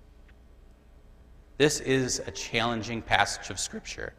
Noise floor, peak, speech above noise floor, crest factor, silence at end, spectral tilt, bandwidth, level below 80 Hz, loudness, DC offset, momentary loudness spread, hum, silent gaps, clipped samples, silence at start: -54 dBFS; -4 dBFS; 25 dB; 26 dB; 0.05 s; -3 dB/octave; 15.5 kHz; -50 dBFS; -28 LUFS; under 0.1%; 8 LU; none; none; under 0.1%; 0.2 s